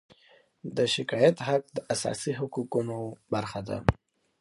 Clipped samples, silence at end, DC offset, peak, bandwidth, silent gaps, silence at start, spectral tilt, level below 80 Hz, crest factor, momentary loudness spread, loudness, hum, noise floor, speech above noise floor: under 0.1%; 0.45 s; under 0.1%; -2 dBFS; 11.5 kHz; none; 0.65 s; -5 dB/octave; -48 dBFS; 28 dB; 12 LU; -29 LUFS; none; -61 dBFS; 33 dB